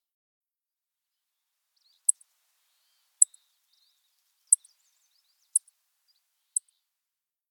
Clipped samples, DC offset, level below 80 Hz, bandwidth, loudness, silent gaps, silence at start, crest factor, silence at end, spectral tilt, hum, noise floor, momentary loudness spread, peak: under 0.1%; under 0.1%; under -90 dBFS; 19.5 kHz; -26 LUFS; none; 2.1 s; 34 dB; 1.9 s; 6.5 dB/octave; none; under -90 dBFS; 9 LU; -2 dBFS